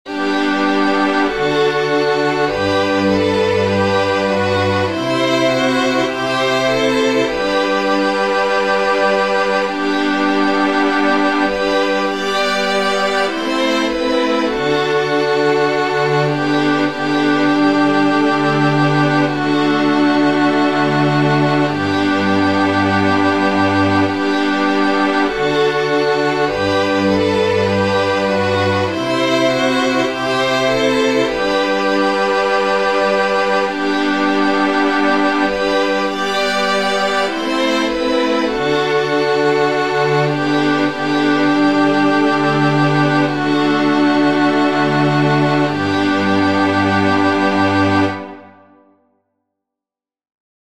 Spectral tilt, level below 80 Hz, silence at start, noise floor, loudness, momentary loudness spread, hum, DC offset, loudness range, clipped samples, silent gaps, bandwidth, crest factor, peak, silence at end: -5.5 dB/octave; -48 dBFS; 0.05 s; -88 dBFS; -15 LUFS; 3 LU; none; 1%; 2 LU; under 0.1%; none; 12 kHz; 12 dB; -2 dBFS; 2.3 s